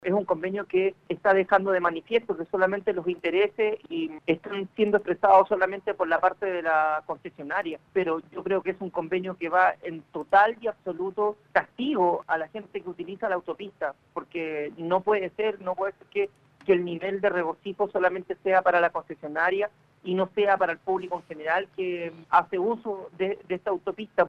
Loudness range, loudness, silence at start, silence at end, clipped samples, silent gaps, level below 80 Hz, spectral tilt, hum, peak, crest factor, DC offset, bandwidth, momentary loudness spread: 5 LU; -26 LUFS; 0.05 s; 0 s; under 0.1%; none; -68 dBFS; -7 dB/octave; none; -6 dBFS; 20 dB; under 0.1%; 6.4 kHz; 10 LU